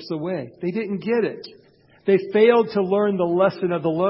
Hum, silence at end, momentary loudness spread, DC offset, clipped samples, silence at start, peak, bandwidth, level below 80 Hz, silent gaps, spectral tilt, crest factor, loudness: none; 0 s; 11 LU; under 0.1%; under 0.1%; 0 s; -4 dBFS; 5.8 kHz; -64 dBFS; none; -11.5 dB/octave; 18 dB; -21 LUFS